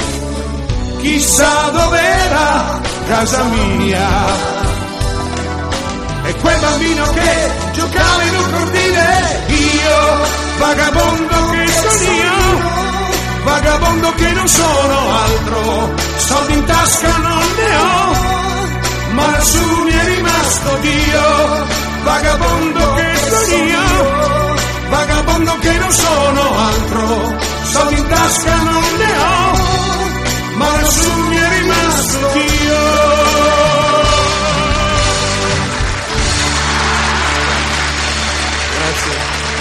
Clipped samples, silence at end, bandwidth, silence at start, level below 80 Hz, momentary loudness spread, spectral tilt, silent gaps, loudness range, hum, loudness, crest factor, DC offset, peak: under 0.1%; 0 s; 14.5 kHz; 0 s; -22 dBFS; 6 LU; -3.5 dB/octave; none; 3 LU; none; -12 LUFS; 12 dB; under 0.1%; 0 dBFS